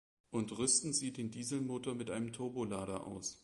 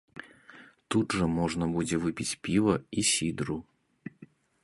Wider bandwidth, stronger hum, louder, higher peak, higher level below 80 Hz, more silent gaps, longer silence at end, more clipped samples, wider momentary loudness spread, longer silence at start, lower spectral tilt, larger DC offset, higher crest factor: about the same, 11.5 kHz vs 11.5 kHz; neither; second, -38 LUFS vs -29 LUFS; second, -18 dBFS vs -10 dBFS; second, -68 dBFS vs -54 dBFS; neither; second, 0.05 s vs 0.4 s; neither; second, 10 LU vs 21 LU; first, 0.3 s vs 0.15 s; about the same, -3.5 dB/octave vs -4.5 dB/octave; neither; about the same, 22 dB vs 20 dB